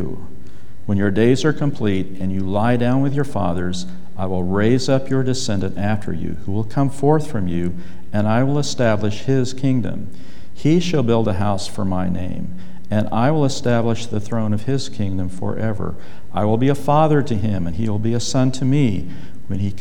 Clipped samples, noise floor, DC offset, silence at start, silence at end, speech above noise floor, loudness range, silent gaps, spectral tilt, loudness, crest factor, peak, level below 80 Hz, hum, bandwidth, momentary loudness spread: under 0.1%; -42 dBFS; 9%; 0 s; 0 s; 23 dB; 2 LU; none; -6.5 dB/octave; -20 LUFS; 18 dB; -4 dBFS; -46 dBFS; none; 13.5 kHz; 11 LU